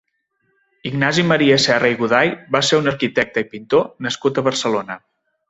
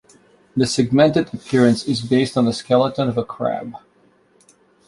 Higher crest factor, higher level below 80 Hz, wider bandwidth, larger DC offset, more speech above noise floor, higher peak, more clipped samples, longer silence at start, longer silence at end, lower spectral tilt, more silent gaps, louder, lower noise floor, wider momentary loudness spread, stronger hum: about the same, 18 dB vs 18 dB; about the same, -58 dBFS vs -54 dBFS; second, 8.2 kHz vs 11.5 kHz; neither; first, 51 dB vs 39 dB; about the same, -2 dBFS vs -2 dBFS; neither; first, 0.85 s vs 0.55 s; second, 0.5 s vs 1.1 s; second, -4.5 dB/octave vs -6 dB/octave; neither; about the same, -17 LUFS vs -19 LUFS; first, -68 dBFS vs -56 dBFS; about the same, 10 LU vs 9 LU; neither